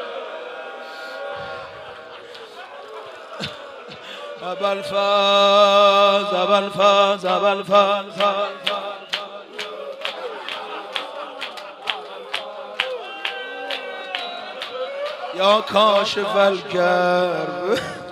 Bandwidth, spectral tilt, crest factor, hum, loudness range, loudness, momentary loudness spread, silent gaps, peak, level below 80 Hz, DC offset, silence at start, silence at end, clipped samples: 13.5 kHz; -3.5 dB/octave; 20 dB; none; 17 LU; -20 LUFS; 20 LU; none; -2 dBFS; -68 dBFS; under 0.1%; 0 s; 0 s; under 0.1%